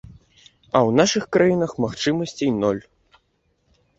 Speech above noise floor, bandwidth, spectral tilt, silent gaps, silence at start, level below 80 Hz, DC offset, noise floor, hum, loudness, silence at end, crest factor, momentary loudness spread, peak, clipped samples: 48 dB; 8 kHz; -5 dB/octave; none; 0.75 s; -54 dBFS; under 0.1%; -67 dBFS; none; -20 LUFS; 1.2 s; 20 dB; 7 LU; -2 dBFS; under 0.1%